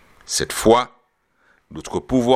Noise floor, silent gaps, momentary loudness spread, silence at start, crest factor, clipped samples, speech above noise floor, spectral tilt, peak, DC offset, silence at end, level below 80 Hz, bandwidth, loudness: -63 dBFS; none; 18 LU; 0.3 s; 20 dB; under 0.1%; 45 dB; -4 dB/octave; 0 dBFS; under 0.1%; 0 s; -44 dBFS; 15.5 kHz; -20 LUFS